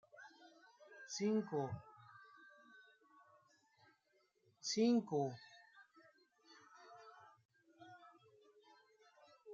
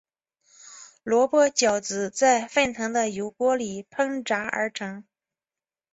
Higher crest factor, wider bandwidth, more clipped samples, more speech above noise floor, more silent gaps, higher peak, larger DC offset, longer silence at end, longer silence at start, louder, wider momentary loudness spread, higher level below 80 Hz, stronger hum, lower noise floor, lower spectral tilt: about the same, 22 dB vs 18 dB; about the same, 7.6 kHz vs 8.2 kHz; neither; second, 41 dB vs over 66 dB; first, 7.45-7.49 s vs none; second, -24 dBFS vs -6 dBFS; neither; second, 0 s vs 0.9 s; second, 0.2 s vs 0.65 s; second, -40 LUFS vs -24 LUFS; first, 28 LU vs 15 LU; second, -86 dBFS vs -64 dBFS; neither; second, -79 dBFS vs under -90 dBFS; first, -5 dB/octave vs -2.5 dB/octave